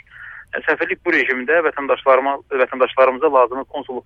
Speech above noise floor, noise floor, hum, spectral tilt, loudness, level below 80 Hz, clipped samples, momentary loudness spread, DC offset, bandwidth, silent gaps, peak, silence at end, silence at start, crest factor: 21 dB; -38 dBFS; none; -5.5 dB/octave; -17 LUFS; -58 dBFS; under 0.1%; 12 LU; under 0.1%; 6.4 kHz; none; -2 dBFS; 0.05 s; 0.15 s; 16 dB